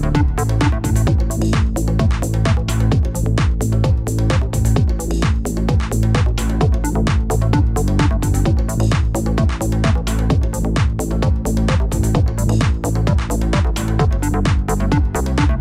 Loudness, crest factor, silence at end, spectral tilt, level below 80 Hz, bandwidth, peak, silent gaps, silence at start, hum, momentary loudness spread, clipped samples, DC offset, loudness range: -18 LUFS; 14 dB; 0 s; -6.5 dB/octave; -20 dBFS; 15.5 kHz; -2 dBFS; none; 0 s; none; 2 LU; under 0.1%; under 0.1%; 1 LU